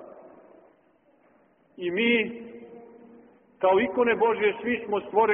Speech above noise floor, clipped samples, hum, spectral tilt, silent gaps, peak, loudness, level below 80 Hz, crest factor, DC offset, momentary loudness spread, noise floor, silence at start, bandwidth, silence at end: 39 dB; under 0.1%; none; 0.5 dB/octave; none; -10 dBFS; -25 LUFS; -68 dBFS; 18 dB; under 0.1%; 21 LU; -63 dBFS; 0 s; 3.8 kHz; 0 s